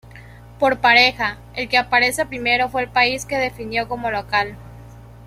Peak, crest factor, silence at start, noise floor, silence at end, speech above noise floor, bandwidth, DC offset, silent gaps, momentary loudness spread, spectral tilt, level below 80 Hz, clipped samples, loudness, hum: -2 dBFS; 18 dB; 0.15 s; -41 dBFS; 0 s; 22 dB; 15.5 kHz; under 0.1%; none; 11 LU; -3 dB/octave; -46 dBFS; under 0.1%; -18 LUFS; none